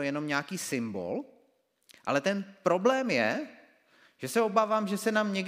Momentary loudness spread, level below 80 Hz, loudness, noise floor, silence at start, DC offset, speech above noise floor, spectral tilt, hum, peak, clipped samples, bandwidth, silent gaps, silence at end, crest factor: 12 LU; -82 dBFS; -29 LUFS; -70 dBFS; 0 s; under 0.1%; 41 dB; -4.5 dB/octave; none; -10 dBFS; under 0.1%; 16 kHz; none; 0 s; 20 dB